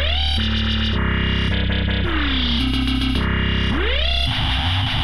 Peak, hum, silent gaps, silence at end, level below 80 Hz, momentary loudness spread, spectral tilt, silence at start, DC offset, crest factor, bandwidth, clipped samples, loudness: -8 dBFS; none; none; 0 s; -24 dBFS; 1 LU; -6 dB/octave; 0 s; 3%; 12 dB; 11 kHz; under 0.1%; -20 LUFS